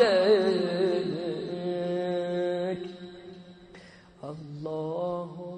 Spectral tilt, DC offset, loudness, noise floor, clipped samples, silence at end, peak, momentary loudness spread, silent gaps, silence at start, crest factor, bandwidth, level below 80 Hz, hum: -6.5 dB/octave; under 0.1%; -28 LUFS; -51 dBFS; under 0.1%; 0 s; -8 dBFS; 23 LU; none; 0 s; 20 dB; 9.2 kHz; -68 dBFS; none